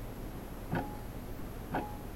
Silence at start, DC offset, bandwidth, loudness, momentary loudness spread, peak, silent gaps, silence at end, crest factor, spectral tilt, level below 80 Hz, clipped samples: 0 s; 0.1%; 16 kHz; -41 LUFS; 7 LU; -22 dBFS; none; 0 s; 18 dB; -6.5 dB/octave; -46 dBFS; under 0.1%